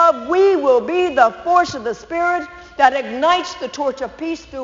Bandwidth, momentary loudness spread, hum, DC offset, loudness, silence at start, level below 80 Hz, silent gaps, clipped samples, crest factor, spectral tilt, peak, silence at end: 7.6 kHz; 12 LU; none; under 0.1%; -17 LUFS; 0 s; -52 dBFS; none; under 0.1%; 16 dB; -1.5 dB/octave; 0 dBFS; 0 s